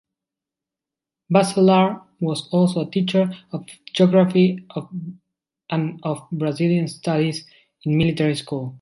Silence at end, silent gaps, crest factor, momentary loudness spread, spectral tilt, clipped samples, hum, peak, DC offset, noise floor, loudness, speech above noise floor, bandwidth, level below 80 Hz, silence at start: 0.05 s; none; 20 dB; 16 LU; -7 dB/octave; under 0.1%; none; -2 dBFS; under 0.1%; -88 dBFS; -20 LUFS; 68 dB; 11.5 kHz; -56 dBFS; 1.3 s